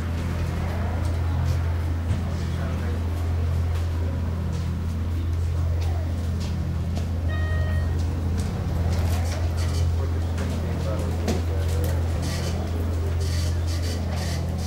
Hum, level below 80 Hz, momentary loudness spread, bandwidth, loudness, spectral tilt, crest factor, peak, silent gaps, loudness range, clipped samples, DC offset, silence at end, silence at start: none; -34 dBFS; 3 LU; 15 kHz; -26 LUFS; -6.5 dB/octave; 14 dB; -10 dBFS; none; 1 LU; under 0.1%; 0.3%; 0 s; 0 s